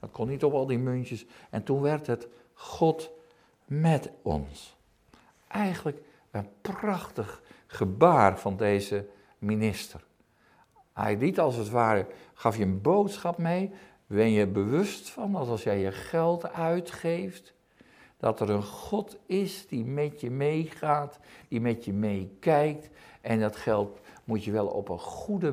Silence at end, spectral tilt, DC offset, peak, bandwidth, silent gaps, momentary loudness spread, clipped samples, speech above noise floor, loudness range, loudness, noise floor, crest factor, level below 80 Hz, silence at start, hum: 0 s; -7 dB/octave; under 0.1%; -4 dBFS; 16 kHz; none; 14 LU; under 0.1%; 36 dB; 5 LU; -29 LUFS; -64 dBFS; 24 dB; -58 dBFS; 0.05 s; none